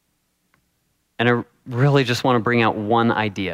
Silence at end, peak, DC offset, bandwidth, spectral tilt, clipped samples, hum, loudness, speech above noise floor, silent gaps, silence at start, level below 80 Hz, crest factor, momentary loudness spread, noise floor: 0 s; -4 dBFS; under 0.1%; 14.5 kHz; -6.5 dB/octave; under 0.1%; none; -19 LUFS; 50 dB; none; 1.2 s; -62 dBFS; 18 dB; 5 LU; -69 dBFS